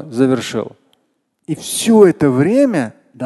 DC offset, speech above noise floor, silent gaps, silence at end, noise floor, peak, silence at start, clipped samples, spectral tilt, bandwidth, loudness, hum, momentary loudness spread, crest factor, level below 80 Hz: under 0.1%; 52 dB; none; 0 s; -65 dBFS; 0 dBFS; 0 s; under 0.1%; -5.5 dB/octave; 12.5 kHz; -14 LUFS; none; 16 LU; 14 dB; -54 dBFS